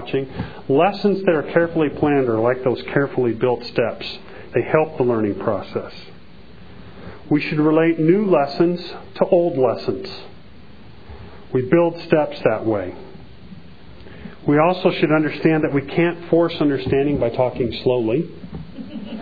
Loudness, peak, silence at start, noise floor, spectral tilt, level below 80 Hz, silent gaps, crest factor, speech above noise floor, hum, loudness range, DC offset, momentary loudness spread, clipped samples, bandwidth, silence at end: -19 LUFS; 0 dBFS; 0 s; -44 dBFS; -9 dB/octave; -48 dBFS; none; 20 dB; 25 dB; none; 4 LU; 1%; 17 LU; under 0.1%; 5 kHz; 0 s